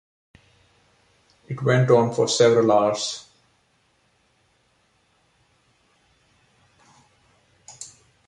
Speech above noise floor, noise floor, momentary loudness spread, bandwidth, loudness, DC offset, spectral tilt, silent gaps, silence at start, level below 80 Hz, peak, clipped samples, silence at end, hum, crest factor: 46 dB; -65 dBFS; 23 LU; 11 kHz; -19 LUFS; under 0.1%; -5 dB/octave; none; 1.5 s; -66 dBFS; -4 dBFS; under 0.1%; 0.4 s; none; 20 dB